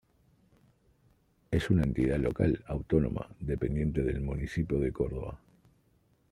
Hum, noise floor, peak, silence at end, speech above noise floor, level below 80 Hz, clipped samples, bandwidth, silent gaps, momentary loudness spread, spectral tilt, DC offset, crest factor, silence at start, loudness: none; -69 dBFS; -12 dBFS; 0.95 s; 39 dB; -42 dBFS; under 0.1%; 12 kHz; none; 8 LU; -8.5 dB/octave; under 0.1%; 20 dB; 1.5 s; -31 LUFS